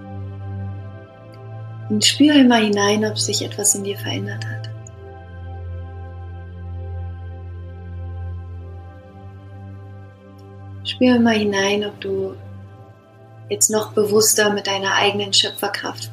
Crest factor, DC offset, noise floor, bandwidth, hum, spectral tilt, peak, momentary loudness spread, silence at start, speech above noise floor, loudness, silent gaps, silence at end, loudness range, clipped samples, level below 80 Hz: 20 dB; under 0.1%; -45 dBFS; 15.5 kHz; none; -3 dB/octave; 0 dBFS; 24 LU; 0 s; 27 dB; -18 LUFS; none; 0 s; 16 LU; under 0.1%; -48 dBFS